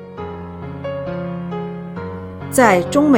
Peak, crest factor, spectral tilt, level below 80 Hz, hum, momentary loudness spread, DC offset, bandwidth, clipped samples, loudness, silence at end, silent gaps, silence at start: 0 dBFS; 18 dB; -5.5 dB/octave; -48 dBFS; none; 17 LU; under 0.1%; 17.5 kHz; under 0.1%; -20 LUFS; 0 s; none; 0 s